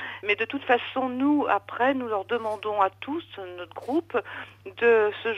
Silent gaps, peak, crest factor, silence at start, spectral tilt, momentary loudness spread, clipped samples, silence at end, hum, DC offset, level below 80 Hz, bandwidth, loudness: none; -8 dBFS; 20 dB; 0 s; -6 dB/octave; 16 LU; under 0.1%; 0 s; none; under 0.1%; -70 dBFS; 10.5 kHz; -25 LUFS